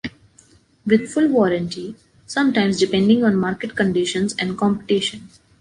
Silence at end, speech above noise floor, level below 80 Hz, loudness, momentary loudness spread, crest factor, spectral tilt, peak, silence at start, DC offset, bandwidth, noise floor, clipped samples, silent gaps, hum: 0.35 s; 35 dB; -54 dBFS; -19 LUFS; 13 LU; 16 dB; -5.5 dB/octave; -2 dBFS; 0.05 s; under 0.1%; 11 kHz; -53 dBFS; under 0.1%; none; none